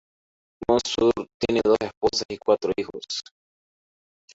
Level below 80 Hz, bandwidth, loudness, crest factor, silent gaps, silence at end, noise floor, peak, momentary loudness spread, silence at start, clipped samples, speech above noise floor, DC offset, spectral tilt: -54 dBFS; 8 kHz; -24 LUFS; 20 dB; 1.34-1.40 s, 1.97-2.01 s, 2.25-2.29 s; 1.15 s; under -90 dBFS; -6 dBFS; 10 LU; 0.6 s; under 0.1%; over 66 dB; under 0.1%; -4 dB/octave